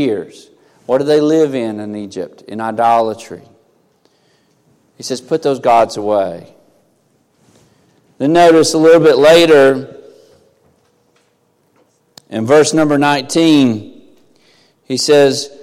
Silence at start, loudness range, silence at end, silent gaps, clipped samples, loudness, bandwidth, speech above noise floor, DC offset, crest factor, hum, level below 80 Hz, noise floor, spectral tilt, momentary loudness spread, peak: 0 s; 8 LU; 0 s; none; under 0.1%; -12 LUFS; 15.5 kHz; 47 dB; under 0.1%; 14 dB; none; -54 dBFS; -58 dBFS; -4.5 dB/octave; 18 LU; 0 dBFS